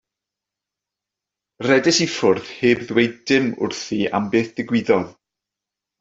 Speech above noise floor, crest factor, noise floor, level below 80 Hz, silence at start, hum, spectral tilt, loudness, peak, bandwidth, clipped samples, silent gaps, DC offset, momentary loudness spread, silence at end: 67 dB; 18 dB; -86 dBFS; -60 dBFS; 1.6 s; none; -4.5 dB/octave; -19 LUFS; -2 dBFS; 8 kHz; under 0.1%; none; under 0.1%; 7 LU; 0.9 s